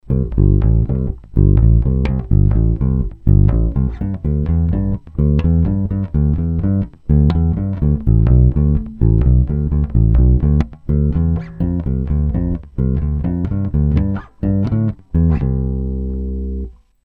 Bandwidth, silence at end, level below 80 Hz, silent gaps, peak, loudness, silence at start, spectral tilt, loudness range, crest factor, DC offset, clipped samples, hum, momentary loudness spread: 4.2 kHz; 0.35 s; -18 dBFS; none; 0 dBFS; -17 LUFS; 0.05 s; -12 dB/octave; 4 LU; 14 dB; under 0.1%; under 0.1%; none; 8 LU